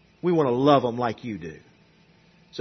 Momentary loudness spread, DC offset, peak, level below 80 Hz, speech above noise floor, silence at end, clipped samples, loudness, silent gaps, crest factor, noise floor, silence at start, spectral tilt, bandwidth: 19 LU; under 0.1%; -4 dBFS; -64 dBFS; 35 dB; 0 s; under 0.1%; -23 LUFS; none; 20 dB; -58 dBFS; 0.25 s; -7.5 dB/octave; 6.4 kHz